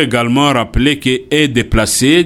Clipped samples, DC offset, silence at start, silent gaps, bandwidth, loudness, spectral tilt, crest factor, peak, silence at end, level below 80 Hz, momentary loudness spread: under 0.1%; under 0.1%; 0 s; none; 17.5 kHz; -12 LUFS; -4 dB/octave; 12 dB; 0 dBFS; 0 s; -26 dBFS; 2 LU